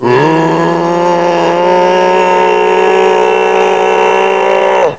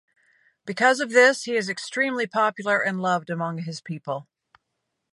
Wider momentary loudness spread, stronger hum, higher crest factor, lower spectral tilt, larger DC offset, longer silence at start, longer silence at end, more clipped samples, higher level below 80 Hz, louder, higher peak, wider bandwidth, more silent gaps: second, 2 LU vs 16 LU; neither; second, 8 dB vs 20 dB; first, -5.5 dB/octave vs -4 dB/octave; first, 0.8% vs under 0.1%; second, 0 s vs 0.65 s; second, 0 s vs 0.9 s; first, 0.4% vs under 0.1%; first, -54 dBFS vs -80 dBFS; first, -9 LUFS vs -23 LUFS; first, 0 dBFS vs -4 dBFS; second, 8 kHz vs 11.5 kHz; neither